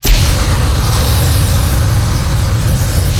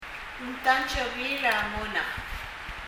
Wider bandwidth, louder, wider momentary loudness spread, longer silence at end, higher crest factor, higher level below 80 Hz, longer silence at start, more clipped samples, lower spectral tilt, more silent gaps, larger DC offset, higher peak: about the same, 18.5 kHz vs 17.5 kHz; first, -13 LUFS vs -28 LUFS; second, 2 LU vs 12 LU; about the same, 0 s vs 0 s; second, 10 dB vs 22 dB; first, -14 dBFS vs -44 dBFS; about the same, 0.05 s vs 0 s; neither; first, -4.5 dB/octave vs -3 dB/octave; neither; neither; first, 0 dBFS vs -8 dBFS